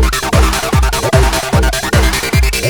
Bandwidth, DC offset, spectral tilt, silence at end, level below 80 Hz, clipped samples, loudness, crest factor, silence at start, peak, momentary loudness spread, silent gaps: over 20 kHz; under 0.1%; -4 dB/octave; 0 s; -16 dBFS; under 0.1%; -12 LUFS; 12 dB; 0 s; 0 dBFS; 1 LU; none